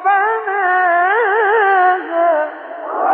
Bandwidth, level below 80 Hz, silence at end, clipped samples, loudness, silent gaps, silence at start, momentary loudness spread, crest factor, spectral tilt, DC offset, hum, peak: 4.2 kHz; -80 dBFS; 0 s; under 0.1%; -14 LUFS; none; 0 s; 9 LU; 10 dB; 2.5 dB/octave; under 0.1%; none; -4 dBFS